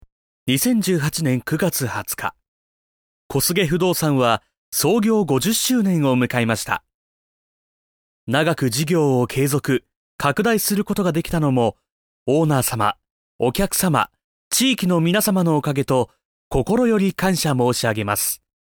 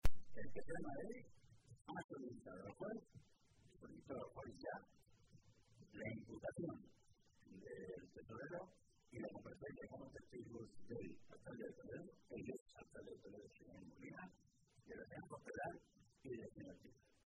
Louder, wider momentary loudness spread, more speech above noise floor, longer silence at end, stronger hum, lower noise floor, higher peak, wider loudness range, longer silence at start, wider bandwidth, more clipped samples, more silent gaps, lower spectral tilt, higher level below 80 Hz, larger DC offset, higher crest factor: first, -19 LUFS vs -55 LUFS; second, 7 LU vs 12 LU; first, over 71 dB vs 19 dB; about the same, 0.3 s vs 0.35 s; neither; first, under -90 dBFS vs -73 dBFS; first, -4 dBFS vs -22 dBFS; about the same, 3 LU vs 3 LU; first, 0.45 s vs 0.05 s; first, 19.5 kHz vs 11 kHz; neither; first, 2.48-3.29 s, 4.57-4.72 s, 6.94-8.27 s, 9.96-10.19 s, 11.92-12.26 s, 13.11-13.39 s, 14.24-14.51 s, 16.25-16.51 s vs 1.81-1.85 s, 2.04-2.09 s, 12.61-12.66 s; second, -4.5 dB/octave vs -6.5 dB/octave; first, -46 dBFS vs -60 dBFS; neither; second, 16 dB vs 26 dB